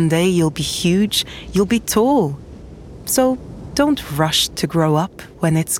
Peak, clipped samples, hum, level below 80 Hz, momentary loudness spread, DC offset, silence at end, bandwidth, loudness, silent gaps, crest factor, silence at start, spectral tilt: -2 dBFS; under 0.1%; none; -42 dBFS; 11 LU; under 0.1%; 0 s; 17.5 kHz; -18 LUFS; none; 16 dB; 0 s; -4.5 dB/octave